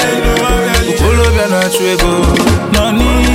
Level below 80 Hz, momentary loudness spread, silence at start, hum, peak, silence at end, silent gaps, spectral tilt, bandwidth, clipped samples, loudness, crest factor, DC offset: -16 dBFS; 2 LU; 0 s; none; 0 dBFS; 0 s; none; -4.5 dB/octave; 16.5 kHz; under 0.1%; -11 LUFS; 10 dB; under 0.1%